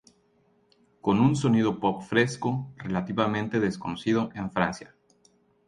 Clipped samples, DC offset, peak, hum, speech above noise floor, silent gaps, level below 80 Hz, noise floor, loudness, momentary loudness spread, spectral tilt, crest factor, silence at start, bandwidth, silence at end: under 0.1%; under 0.1%; -6 dBFS; none; 40 dB; none; -58 dBFS; -66 dBFS; -26 LUFS; 9 LU; -6.5 dB/octave; 20 dB; 1.05 s; 11 kHz; 0.8 s